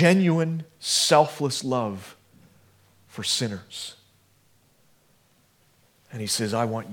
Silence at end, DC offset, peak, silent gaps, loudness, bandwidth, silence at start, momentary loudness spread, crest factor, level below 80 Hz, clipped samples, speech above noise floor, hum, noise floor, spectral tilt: 0 s; under 0.1%; -4 dBFS; none; -24 LUFS; 18 kHz; 0 s; 20 LU; 24 dB; -72 dBFS; under 0.1%; 39 dB; none; -62 dBFS; -4 dB/octave